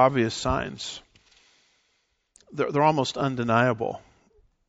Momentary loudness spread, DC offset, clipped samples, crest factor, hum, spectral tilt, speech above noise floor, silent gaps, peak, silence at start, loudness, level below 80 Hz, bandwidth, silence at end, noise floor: 15 LU; under 0.1%; under 0.1%; 22 dB; none; -4.5 dB/octave; 48 dB; none; -6 dBFS; 0 s; -25 LUFS; -48 dBFS; 8 kHz; 0.7 s; -72 dBFS